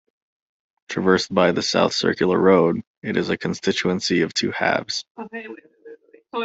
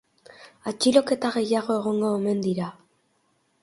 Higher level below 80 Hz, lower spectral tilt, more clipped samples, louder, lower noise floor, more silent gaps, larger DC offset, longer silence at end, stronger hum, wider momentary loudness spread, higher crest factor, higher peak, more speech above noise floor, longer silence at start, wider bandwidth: first, -60 dBFS vs -68 dBFS; about the same, -4.5 dB/octave vs -5 dB/octave; neither; first, -20 LUFS vs -24 LUFS; second, -45 dBFS vs -69 dBFS; first, 2.87-3.02 s, 5.10-5.15 s vs none; neither; second, 0 s vs 0.9 s; neither; first, 16 LU vs 13 LU; about the same, 20 dB vs 20 dB; about the same, -2 dBFS vs -4 dBFS; second, 25 dB vs 45 dB; first, 0.9 s vs 0.4 s; second, 8.2 kHz vs 11.5 kHz